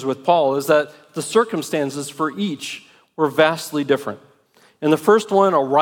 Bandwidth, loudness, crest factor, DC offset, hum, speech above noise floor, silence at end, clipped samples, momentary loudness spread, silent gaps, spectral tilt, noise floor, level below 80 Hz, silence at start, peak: 17.5 kHz; -19 LUFS; 18 dB; under 0.1%; none; 37 dB; 0 s; under 0.1%; 13 LU; none; -5 dB/octave; -55 dBFS; -72 dBFS; 0 s; -2 dBFS